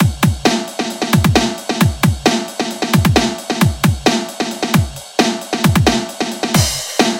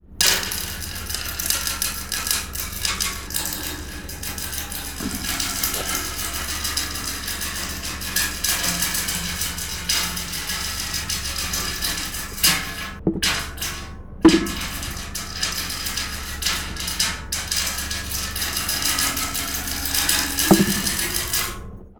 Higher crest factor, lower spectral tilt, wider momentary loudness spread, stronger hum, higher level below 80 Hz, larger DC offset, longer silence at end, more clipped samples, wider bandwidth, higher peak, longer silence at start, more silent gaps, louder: second, 16 dB vs 22 dB; first, -4.5 dB/octave vs -2 dB/octave; about the same, 8 LU vs 10 LU; neither; about the same, -32 dBFS vs -36 dBFS; neither; about the same, 0 s vs 0.05 s; neither; second, 17 kHz vs over 20 kHz; about the same, 0 dBFS vs -2 dBFS; about the same, 0 s vs 0.05 s; neither; first, -15 LUFS vs -22 LUFS